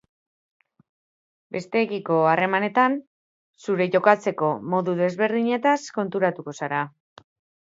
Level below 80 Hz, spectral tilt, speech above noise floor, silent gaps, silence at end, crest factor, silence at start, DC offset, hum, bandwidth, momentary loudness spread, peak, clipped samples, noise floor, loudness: -74 dBFS; -6 dB/octave; over 68 dB; 3.07-3.54 s; 0.85 s; 22 dB; 1.5 s; under 0.1%; none; 7.8 kHz; 11 LU; -2 dBFS; under 0.1%; under -90 dBFS; -23 LUFS